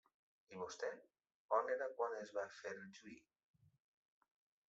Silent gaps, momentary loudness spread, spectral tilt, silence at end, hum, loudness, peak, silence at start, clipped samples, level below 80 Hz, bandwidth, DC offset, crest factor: 1.34-1.49 s; 19 LU; -2.5 dB/octave; 1.5 s; none; -45 LUFS; -24 dBFS; 0.5 s; under 0.1%; under -90 dBFS; 8 kHz; under 0.1%; 24 dB